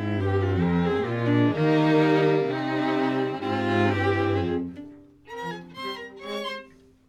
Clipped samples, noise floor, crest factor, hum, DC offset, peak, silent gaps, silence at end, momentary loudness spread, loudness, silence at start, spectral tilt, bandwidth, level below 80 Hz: under 0.1%; -48 dBFS; 14 dB; none; under 0.1%; -10 dBFS; none; 0.45 s; 15 LU; -24 LUFS; 0 s; -7.5 dB/octave; 9.6 kHz; -58 dBFS